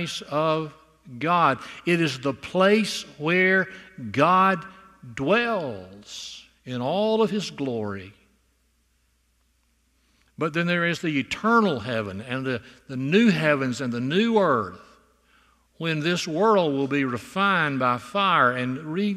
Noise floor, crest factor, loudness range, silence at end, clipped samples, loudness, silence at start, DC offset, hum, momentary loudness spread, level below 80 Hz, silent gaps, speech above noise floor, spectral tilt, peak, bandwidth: -67 dBFS; 20 dB; 7 LU; 0 s; under 0.1%; -23 LUFS; 0 s; under 0.1%; none; 14 LU; -64 dBFS; none; 43 dB; -5.5 dB/octave; -4 dBFS; 14 kHz